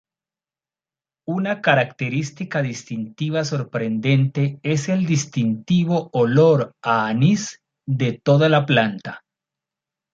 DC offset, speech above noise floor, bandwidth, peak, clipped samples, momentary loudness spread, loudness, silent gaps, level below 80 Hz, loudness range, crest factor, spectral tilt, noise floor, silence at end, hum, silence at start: under 0.1%; over 71 dB; 7.8 kHz; -2 dBFS; under 0.1%; 11 LU; -20 LUFS; none; -62 dBFS; 5 LU; 18 dB; -6 dB/octave; under -90 dBFS; 0.95 s; none; 1.3 s